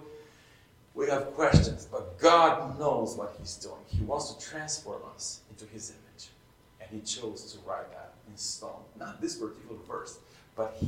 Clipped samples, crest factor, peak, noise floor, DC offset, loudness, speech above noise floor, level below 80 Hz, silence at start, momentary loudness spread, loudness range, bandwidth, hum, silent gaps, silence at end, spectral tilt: under 0.1%; 24 dB; -8 dBFS; -59 dBFS; under 0.1%; -30 LUFS; 28 dB; -48 dBFS; 0 s; 23 LU; 13 LU; 15.5 kHz; none; none; 0 s; -4.5 dB/octave